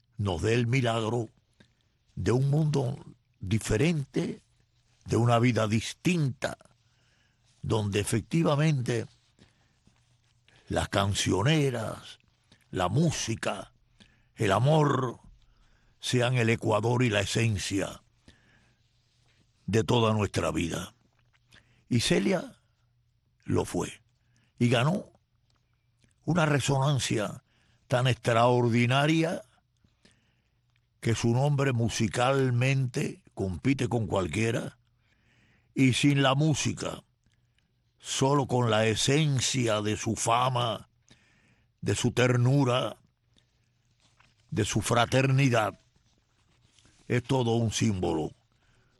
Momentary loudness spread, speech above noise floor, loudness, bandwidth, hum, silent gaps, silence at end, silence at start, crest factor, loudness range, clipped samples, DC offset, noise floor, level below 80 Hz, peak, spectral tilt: 12 LU; 44 dB; -27 LUFS; 12.5 kHz; none; none; 0.7 s; 0.2 s; 18 dB; 4 LU; under 0.1%; under 0.1%; -71 dBFS; -54 dBFS; -10 dBFS; -5.5 dB/octave